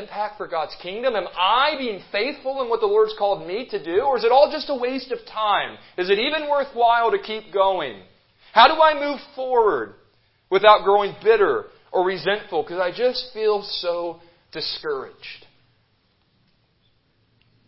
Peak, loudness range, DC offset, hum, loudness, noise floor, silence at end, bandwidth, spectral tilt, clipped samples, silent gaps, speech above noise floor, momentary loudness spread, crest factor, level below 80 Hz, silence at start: 0 dBFS; 9 LU; under 0.1%; none; -21 LUFS; -64 dBFS; 2.3 s; 5.8 kHz; -7.5 dB/octave; under 0.1%; none; 44 dB; 13 LU; 20 dB; -58 dBFS; 0 s